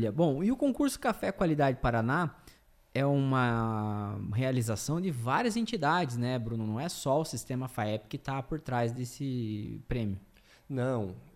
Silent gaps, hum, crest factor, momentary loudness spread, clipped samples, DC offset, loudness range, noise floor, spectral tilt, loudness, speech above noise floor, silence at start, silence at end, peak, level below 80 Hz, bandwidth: none; none; 16 dB; 9 LU; under 0.1%; under 0.1%; 5 LU; -59 dBFS; -6 dB/octave; -31 LUFS; 28 dB; 0 s; 0.05 s; -16 dBFS; -52 dBFS; 16 kHz